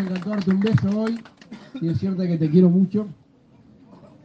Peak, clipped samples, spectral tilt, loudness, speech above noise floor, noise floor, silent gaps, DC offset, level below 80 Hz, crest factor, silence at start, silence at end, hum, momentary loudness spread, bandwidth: -6 dBFS; under 0.1%; -9.5 dB/octave; -21 LUFS; 32 dB; -53 dBFS; none; under 0.1%; -60 dBFS; 16 dB; 0 s; 1.1 s; none; 17 LU; 6.4 kHz